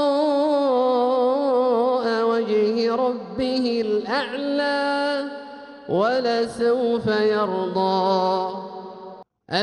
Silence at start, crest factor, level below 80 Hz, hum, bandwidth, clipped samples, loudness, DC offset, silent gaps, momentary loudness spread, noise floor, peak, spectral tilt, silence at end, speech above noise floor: 0 s; 14 dB; -62 dBFS; none; 11 kHz; under 0.1%; -21 LUFS; under 0.1%; none; 13 LU; -42 dBFS; -8 dBFS; -6 dB/octave; 0 s; 20 dB